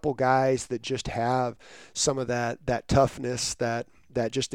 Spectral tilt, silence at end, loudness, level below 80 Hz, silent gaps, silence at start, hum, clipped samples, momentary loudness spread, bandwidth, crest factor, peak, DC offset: -4.5 dB/octave; 0 s; -27 LUFS; -46 dBFS; none; 0.05 s; none; under 0.1%; 9 LU; 16 kHz; 20 dB; -8 dBFS; 0.1%